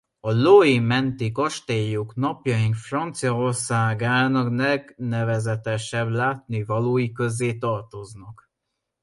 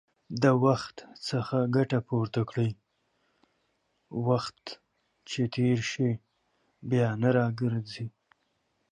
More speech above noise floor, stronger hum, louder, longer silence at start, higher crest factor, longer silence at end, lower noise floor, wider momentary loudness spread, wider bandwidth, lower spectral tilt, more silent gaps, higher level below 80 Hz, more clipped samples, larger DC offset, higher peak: first, 58 dB vs 48 dB; neither; first, -22 LUFS vs -29 LUFS; about the same, 0.25 s vs 0.3 s; about the same, 20 dB vs 20 dB; about the same, 0.7 s vs 0.8 s; first, -80 dBFS vs -75 dBFS; second, 9 LU vs 16 LU; about the same, 11.5 kHz vs 10.5 kHz; about the same, -6 dB/octave vs -7 dB/octave; neither; first, -58 dBFS vs -66 dBFS; neither; neither; first, -2 dBFS vs -10 dBFS